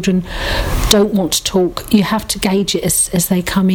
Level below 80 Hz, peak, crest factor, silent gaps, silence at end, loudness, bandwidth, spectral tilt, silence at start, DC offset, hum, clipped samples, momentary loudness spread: -26 dBFS; 0 dBFS; 14 dB; none; 0 s; -15 LUFS; over 20 kHz; -4 dB/octave; 0 s; under 0.1%; none; under 0.1%; 6 LU